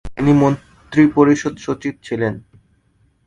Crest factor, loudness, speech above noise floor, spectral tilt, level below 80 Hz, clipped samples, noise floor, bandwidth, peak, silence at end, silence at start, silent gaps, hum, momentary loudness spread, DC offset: 18 dB; -17 LUFS; 43 dB; -7.5 dB/octave; -44 dBFS; under 0.1%; -59 dBFS; 8.8 kHz; 0 dBFS; 0.85 s; 0.05 s; none; none; 12 LU; under 0.1%